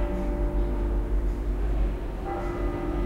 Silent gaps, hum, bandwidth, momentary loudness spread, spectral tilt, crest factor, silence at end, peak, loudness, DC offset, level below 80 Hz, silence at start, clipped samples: none; none; 4.8 kHz; 3 LU; -8.5 dB/octave; 10 dB; 0 s; -16 dBFS; -30 LUFS; under 0.1%; -28 dBFS; 0 s; under 0.1%